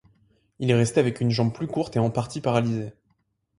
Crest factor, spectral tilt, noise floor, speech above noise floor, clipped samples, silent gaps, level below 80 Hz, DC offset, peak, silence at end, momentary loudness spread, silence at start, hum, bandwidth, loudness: 20 dB; -6.5 dB/octave; -71 dBFS; 48 dB; under 0.1%; none; -56 dBFS; under 0.1%; -6 dBFS; 0.65 s; 8 LU; 0.6 s; none; 11.5 kHz; -24 LUFS